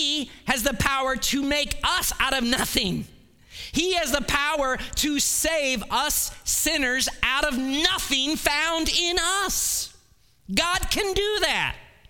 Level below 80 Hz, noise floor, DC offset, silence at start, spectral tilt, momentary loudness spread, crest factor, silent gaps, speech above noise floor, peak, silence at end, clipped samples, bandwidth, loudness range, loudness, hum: -40 dBFS; -59 dBFS; under 0.1%; 0 s; -1.5 dB/octave; 5 LU; 20 dB; none; 35 dB; -4 dBFS; 0.25 s; under 0.1%; 19 kHz; 2 LU; -23 LUFS; none